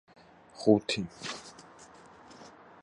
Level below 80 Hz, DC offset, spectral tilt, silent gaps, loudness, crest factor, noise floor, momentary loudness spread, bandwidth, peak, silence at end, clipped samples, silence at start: -66 dBFS; under 0.1%; -5 dB/octave; none; -30 LUFS; 24 dB; -54 dBFS; 27 LU; 11 kHz; -10 dBFS; 0.35 s; under 0.1%; 0.55 s